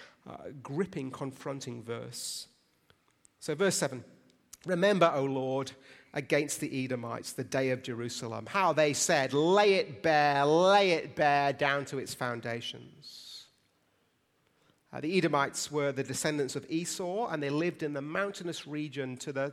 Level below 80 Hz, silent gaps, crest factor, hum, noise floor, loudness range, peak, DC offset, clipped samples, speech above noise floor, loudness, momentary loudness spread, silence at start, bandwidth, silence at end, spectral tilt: -74 dBFS; none; 22 dB; none; -73 dBFS; 10 LU; -10 dBFS; under 0.1%; under 0.1%; 42 dB; -30 LUFS; 17 LU; 0 s; 16 kHz; 0 s; -4 dB/octave